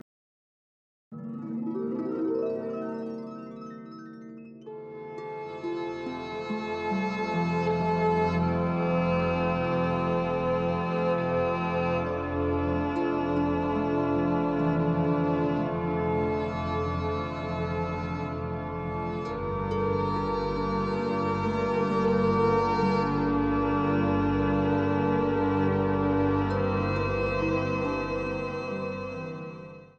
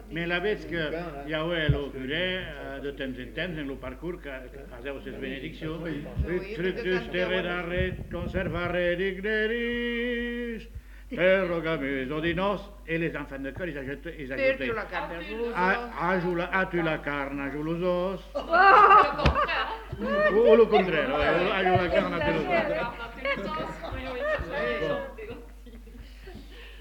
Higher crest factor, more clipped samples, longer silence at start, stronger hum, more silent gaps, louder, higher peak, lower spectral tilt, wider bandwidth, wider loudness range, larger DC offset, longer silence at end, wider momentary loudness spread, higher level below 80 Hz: second, 14 dB vs 24 dB; neither; first, 1.1 s vs 0 s; neither; neither; about the same, -28 LUFS vs -27 LUFS; second, -14 dBFS vs -4 dBFS; first, -8.5 dB/octave vs -6.5 dB/octave; second, 7.8 kHz vs 18.5 kHz; second, 8 LU vs 12 LU; neither; about the same, 0.1 s vs 0 s; about the same, 12 LU vs 14 LU; about the same, -46 dBFS vs -42 dBFS